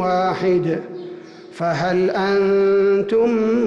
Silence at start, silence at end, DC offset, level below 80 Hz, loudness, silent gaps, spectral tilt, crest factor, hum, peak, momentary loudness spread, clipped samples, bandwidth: 0 s; 0 s; under 0.1%; -56 dBFS; -18 LUFS; none; -7 dB/octave; 8 dB; none; -10 dBFS; 17 LU; under 0.1%; 7.4 kHz